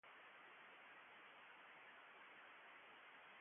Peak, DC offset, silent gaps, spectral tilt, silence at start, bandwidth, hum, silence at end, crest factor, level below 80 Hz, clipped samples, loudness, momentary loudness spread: -52 dBFS; under 0.1%; none; 3.5 dB/octave; 0.05 s; 3.6 kHz; none; 0 s; 12 dB; under -90 dBFS; under 0.1%; -62 LUFS; 1 LU